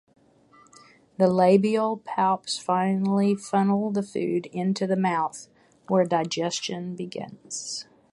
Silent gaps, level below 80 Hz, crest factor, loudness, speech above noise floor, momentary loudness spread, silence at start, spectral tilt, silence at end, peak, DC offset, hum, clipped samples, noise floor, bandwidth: none; -70 dBFS; 20 dB; -25 LUFS; 33 dB; 14 LU; 1.2 s; -5.5 dB/octave; 0.3 s; -6 dBFS; under 0.1%; none; under 0.1%; -57 dBFS; 11.5 kHz